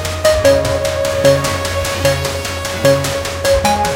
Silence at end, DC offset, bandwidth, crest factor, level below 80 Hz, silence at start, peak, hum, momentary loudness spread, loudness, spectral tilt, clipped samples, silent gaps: 0 s; under 0.1%; 17 kHz; 14 dB; -30 dBFS; 0 s; 0 dBFS; none; 6 LU; -14 LUFS; -4 dB/octave; under 0.1%; none